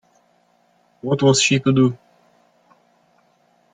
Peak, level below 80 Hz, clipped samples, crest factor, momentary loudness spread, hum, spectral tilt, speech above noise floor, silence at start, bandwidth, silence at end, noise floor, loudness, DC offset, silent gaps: -4 dBFS; -60 dBFS; under 0.1%; 18 dB; 16 LU; none; -4.5 dB/octave; 44 dB; 1.05 s; 9.6 kHz; 1.8 s; -60 dBFS; -17 LUFS; under 0.1%; none